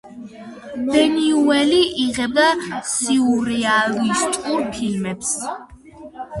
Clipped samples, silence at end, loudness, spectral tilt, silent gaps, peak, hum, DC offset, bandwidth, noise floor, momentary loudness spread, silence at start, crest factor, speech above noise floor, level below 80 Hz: under 0.1%; 0 s; -18 LUFS; -3 dB/octave; none; -2 dBFS; none; under 0.1%; 11.5 kHz; -39 dBFS; 19 LU; 0.05 s; 18 dB; 21 dB; -52 dBFS